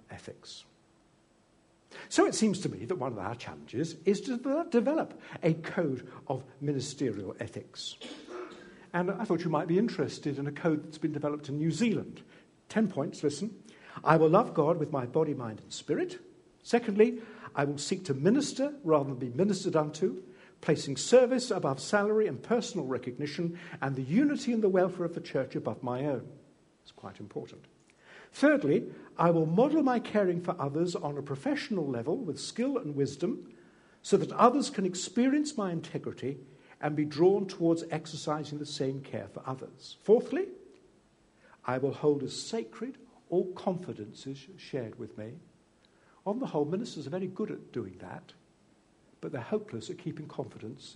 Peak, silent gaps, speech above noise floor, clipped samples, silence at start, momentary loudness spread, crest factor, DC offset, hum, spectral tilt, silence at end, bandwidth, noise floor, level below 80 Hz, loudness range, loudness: -6 dBFS; none; 35 dB; under 0.1%; 0.1 s; 16 LU; 24 dB; under 0.1%; none; -6 dB/octave; 0 s; 10.5 kHz; -66 dBFS; -74 dBFS; 8 LU; -31 LUFS